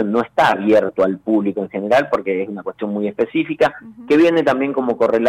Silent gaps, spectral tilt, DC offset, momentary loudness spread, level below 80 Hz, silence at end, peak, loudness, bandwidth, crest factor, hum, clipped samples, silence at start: none; -6.5 dB/octave; under 0.1%; 9 LU; -56 dBFS; 0 s; -6 dBFS; -17 LUFS; 11.5 kHz; 10 dB; none; under 0.1%; 0 s